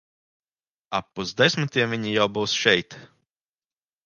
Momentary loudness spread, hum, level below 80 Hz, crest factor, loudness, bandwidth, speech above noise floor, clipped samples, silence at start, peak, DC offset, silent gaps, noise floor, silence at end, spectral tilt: 10 LU; none; -62 dBFS; 24 dB; -23 LUFS; 10 kHz; over 67 dB; under 0.1%; 0.9 s; -2 dBFS; under 0.1%; none; under -90 dBFS; 1 s; -4 dB/octave